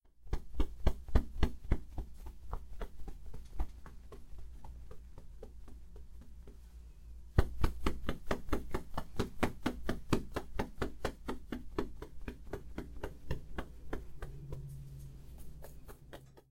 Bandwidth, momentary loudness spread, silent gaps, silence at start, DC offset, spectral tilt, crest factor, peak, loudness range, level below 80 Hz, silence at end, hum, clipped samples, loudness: 16 kHz; 19 LU; none; 0.05 s; under 0.1%; -6.5 dB/octave; 24 dB; -12 dBFS; 13 LU; -42 dBFS; 0.1 s; none; under 0.1%; -41 LUFS